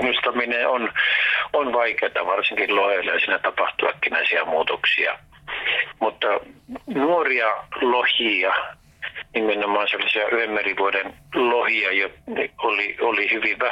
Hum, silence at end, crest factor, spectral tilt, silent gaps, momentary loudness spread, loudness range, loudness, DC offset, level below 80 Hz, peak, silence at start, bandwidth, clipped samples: none; 0 s; 12 dB; -4.5 dB/octave; none; 8 LU; 2 LU; -21 LUFS; under 0.1%; -60 dBFS; -10 dBFS; 0 s; 10 kHz; under 0.1%